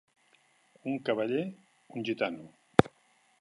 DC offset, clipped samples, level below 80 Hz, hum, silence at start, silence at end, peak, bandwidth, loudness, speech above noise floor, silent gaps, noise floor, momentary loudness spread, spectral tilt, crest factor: under 0.1%; under 0.1%; -62 dBFS; none; 0.85 s; 0.55 s; -2 dBFS; 11.5 kHz; -31 LUFS; 35 dB; none; -68 dBFS; 16 LU; -7 dB/octave; 32 dB